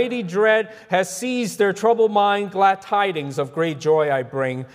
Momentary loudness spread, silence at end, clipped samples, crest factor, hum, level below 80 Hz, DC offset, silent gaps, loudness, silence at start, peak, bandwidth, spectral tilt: 7 LU; 0.1 s; under 0.1%; 16 dB; none; -70 dBFS; under 0.1%; none; -20 LUFS; 0 s; -4 dBFS; 16 kHz; -4.5 dB/octave